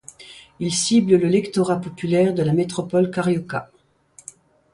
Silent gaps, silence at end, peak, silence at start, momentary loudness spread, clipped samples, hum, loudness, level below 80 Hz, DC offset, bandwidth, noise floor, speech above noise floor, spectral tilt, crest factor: none; 1.1 s; -4 dBFS; 0.2 s; 24 LU; under 0.1%; none; -20 LUFS; -58 dBFS; under 0.1%; 11.5 kHz; -53 dBFS; 33 dB; -5.5 dB/octave; 18 dB